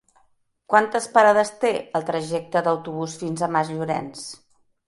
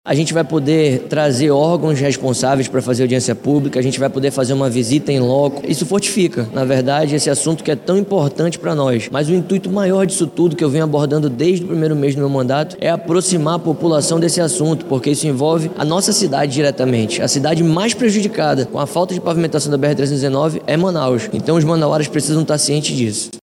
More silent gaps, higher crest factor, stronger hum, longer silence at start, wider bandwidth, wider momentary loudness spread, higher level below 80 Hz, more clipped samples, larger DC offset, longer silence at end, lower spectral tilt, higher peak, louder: neither; first, 20 dB vs 12 dB; neither; first, 0.7 s vs 0.05 s; second, 11.5 kHz vs 16 kHz; first, 12 LU vs 3 LU; second, -68 dBFS vs -56 dBFS; neither; neither; first, 0.55 s vs 0.05 s; about the same, -4.5 dB/octave vs -5 dB/octave; about the same, -2 dBFS vs -2 dBFS; second, -22 LUFS vs -16 LUFS